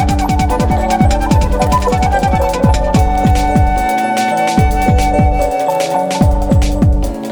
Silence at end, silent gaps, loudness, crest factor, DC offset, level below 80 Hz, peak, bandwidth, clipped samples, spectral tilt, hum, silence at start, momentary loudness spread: 0 s; none; -13 LUFS; 12 dB; under 0.1%; -16 dBFS; 0 dBFS; over 20 kHz; under 0.1%; -6.5 dB/octave; none; 0 s; 2 LU